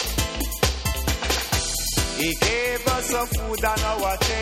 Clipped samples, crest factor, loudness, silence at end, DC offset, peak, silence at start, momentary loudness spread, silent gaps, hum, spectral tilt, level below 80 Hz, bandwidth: under 0.1%; 18 dB; -23 LUFS; 0 s; under 0.1%; -6 dBFS; 0 s; 4 LU; none; none; -3 dB/octave; -30 dBFS; 16.5 kHz